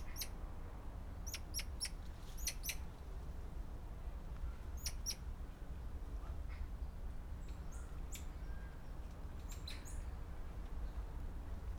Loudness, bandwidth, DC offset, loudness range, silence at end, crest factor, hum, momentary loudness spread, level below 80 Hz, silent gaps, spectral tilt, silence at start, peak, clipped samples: -49 LUFS; over 20 kHz; under 0.1%; 4 LU; 0 s; 18 dB; none; 8 LU; -46 dBFS; none; -3.5 dB/octave; 0 s; -28 dBFS; under 0.1%